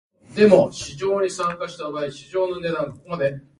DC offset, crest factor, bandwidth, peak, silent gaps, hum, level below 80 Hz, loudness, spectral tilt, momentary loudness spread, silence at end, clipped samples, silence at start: under 0.1%; 22 dB; 11.5 kHz; 0 dBFS; none; none; -56 dBFS; -22 LUFS; -5.5 dB/octave; 14 LU; 0.2 s; under 0.1%; 0.3 s